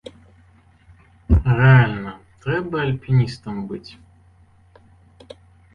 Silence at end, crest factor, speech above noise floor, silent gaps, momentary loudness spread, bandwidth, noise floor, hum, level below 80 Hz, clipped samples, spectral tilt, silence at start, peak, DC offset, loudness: 1.85 s; 20 dB; 35 dB; none; 19 LU; 5.6 kHz; -53 dBFS; none; -32 dBFS; under 0.1%; -8.5 dB/octave; 1.3 s; -2 dBFS; under 0.1%; -19 LUFS